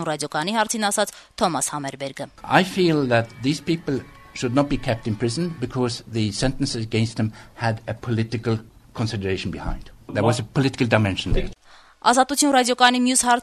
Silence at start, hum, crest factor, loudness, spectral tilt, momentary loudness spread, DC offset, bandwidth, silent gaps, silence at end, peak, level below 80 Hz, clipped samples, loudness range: 0 s; none; 20 dB; -22 LUFS; -4.5 dB/octave; 12 LU; under 0.1%; 13.5 kHz; none; 0 s; -2 dBFS; -38 dBFS; under 0.1%; 5 LU